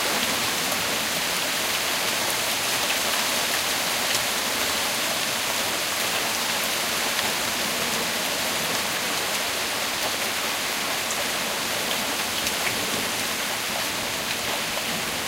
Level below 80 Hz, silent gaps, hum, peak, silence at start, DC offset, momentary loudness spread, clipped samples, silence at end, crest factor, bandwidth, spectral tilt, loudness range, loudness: -56 dBFS; none; none; -6 dBFS; 0 s; under 0.1%; 3 LU; under 0.1%; 0 s; 18 dB; 16 kHz; -0.5 dB/octave; 2 LU; -23 LUFS